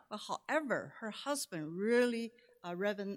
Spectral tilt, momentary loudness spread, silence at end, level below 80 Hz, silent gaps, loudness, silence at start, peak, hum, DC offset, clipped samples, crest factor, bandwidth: -4 dB/octave; 13 LU; 0 s; -88 dBFS; none; -37 LUFS; 0.1 s; -20 dBFS; none; under 0.1%; under 0.1%; 18 dB; 16 kHz